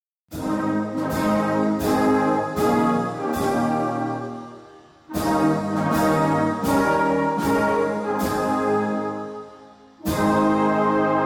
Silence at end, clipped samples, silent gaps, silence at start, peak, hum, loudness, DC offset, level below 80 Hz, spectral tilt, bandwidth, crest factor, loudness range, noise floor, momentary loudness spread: 0 s; under 0.1%; none; 0.3 s; -10 dBFS; none; -22 LUFS; under 0.1%; -48 dBFS; -6.5 dB/octave; 18 kHz; 12 dB; 3 LU; -47 dBFS; 12 LU